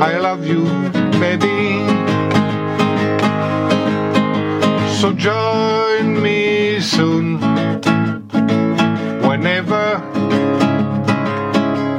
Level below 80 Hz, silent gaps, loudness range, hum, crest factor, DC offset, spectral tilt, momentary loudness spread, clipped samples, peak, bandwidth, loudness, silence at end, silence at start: -56 dBFS; none; 1 LU; none; 16 dB; under 0.1%; -6 dB/octave; 3 LU; under 0.1%; 0 dBFS; 11.5 kHz; -16 LUFS; 0 s; 0 s